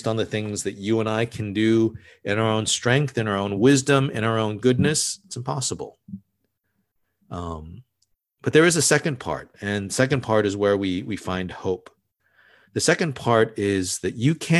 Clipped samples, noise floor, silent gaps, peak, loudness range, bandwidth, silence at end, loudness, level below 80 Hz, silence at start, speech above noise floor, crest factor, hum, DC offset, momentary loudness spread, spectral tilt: under 0.1%; -74 dBFS; none; -2 dBFS; 5 LU; 13 kHz; 0 s; -22 LUFS; -50 dBFS; 0 s; 52 dB; 20 dB; none; under 0.1%; 14 LU; -4.5 dB/octave